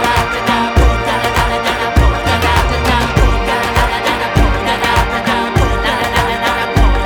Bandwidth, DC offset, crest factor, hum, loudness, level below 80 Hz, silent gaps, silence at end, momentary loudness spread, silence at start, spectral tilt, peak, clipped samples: 20 kHz; under 0.1%; 12 dB; none; -13 LUFS; -18 dBFS; none; 0 s; 2 LU; 0 s; -5 dB/octave; 0 dBFS; under 0.1%